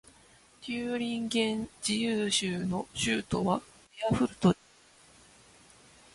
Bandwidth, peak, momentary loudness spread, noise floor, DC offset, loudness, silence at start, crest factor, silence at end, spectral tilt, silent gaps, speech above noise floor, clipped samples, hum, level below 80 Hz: 11.5 kHz; -10 dBFS; 8 LU; -60 dBFS; under 0.1%; -30 LUFS; 0.6 s; 22 dB; 1.6 s; -4.5 dB/octave; none; 30 dB; under 0.1%; none; -58 dBFS